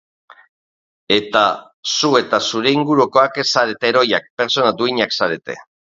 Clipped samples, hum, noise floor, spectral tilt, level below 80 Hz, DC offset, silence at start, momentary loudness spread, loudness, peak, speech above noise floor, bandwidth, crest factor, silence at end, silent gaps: under 0.1%; none; under -90 dBFS; -3.5 dB/octave; -62 dBFS; under 0.1%; 1.1 s; 6 LU; -16 LUFS; 0 dBFS; over 74 dB; 7.8 kHz; 18 dB; 0.3 s; 1.74-1.83 s, 4.30-4.37 s